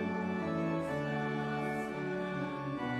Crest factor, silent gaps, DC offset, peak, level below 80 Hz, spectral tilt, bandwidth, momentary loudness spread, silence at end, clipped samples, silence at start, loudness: 12 dB; none; under 0.1%; -22 dBFS; -64 dBFS; -7.5 dB/octave; 14 kHz; 3 LU; 0 s; under 0.1%; 0 s; -36 LUFS